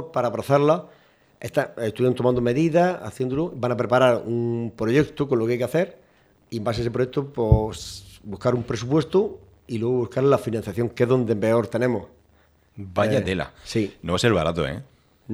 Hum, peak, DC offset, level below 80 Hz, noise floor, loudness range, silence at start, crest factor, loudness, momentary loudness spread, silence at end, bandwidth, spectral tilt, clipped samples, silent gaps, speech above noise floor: none; -2 dBFS; under 0.1%; -40 dBFS; -59 dBFS; 3 LU; 0 s; 20 dB; -23 LUFS; 10 LU; 0 s; 15 kHz; -7 dB/octave; under 0.1%; none; 37 dB